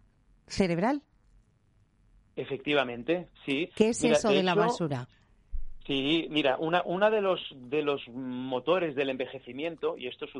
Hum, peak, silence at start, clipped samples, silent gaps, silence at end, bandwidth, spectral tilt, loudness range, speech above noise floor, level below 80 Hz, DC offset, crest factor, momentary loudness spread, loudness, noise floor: none; -8 dBFS; 0.5 s; under 0.1%; none; 0 s; 11.5 kHz; -5 dB/octave; 4 LU; 37 dB; -50 dBFS; under 0.1%; 22 dB; 13 LU; -29 LUFS; -66 dBFS